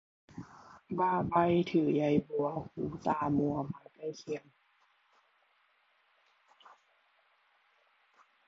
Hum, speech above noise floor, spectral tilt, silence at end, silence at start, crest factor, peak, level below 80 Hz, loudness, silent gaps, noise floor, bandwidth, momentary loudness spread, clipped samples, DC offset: none; 40 dB; -8 dB/octave; 4.1 s; 0.35 s; 20 dB; -16 dBFS; -64 dBFS; -32 LUFS; none; -71 dBFS; 7.6 kHz; 20 LU; under 0.1%; under 0.1%